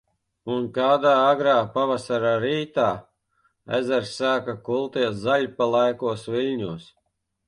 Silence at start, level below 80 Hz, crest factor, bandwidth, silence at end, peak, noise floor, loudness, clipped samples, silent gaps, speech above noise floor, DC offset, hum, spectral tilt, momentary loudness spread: 0.45 s; -62 dBFS; 16 dB; 11 kHz; 0.65 s; -8 dBFS; -68 dBFS; -23 LUFS; under 0.1%; none; 46 dB; under 0.1%; none; -5.5 dB/octave; 10 LU